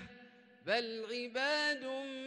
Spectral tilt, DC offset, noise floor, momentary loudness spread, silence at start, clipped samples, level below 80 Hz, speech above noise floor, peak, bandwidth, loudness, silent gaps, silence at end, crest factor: -2.5 dB/octave; under 0.1%; -60 dBFS; 12 LU; 0 s; under 0.1%; -80 dBFS; 23 dB; -20 dBFS; 11.5 kHz; -36 LUFS; none; 0 s; 18 dB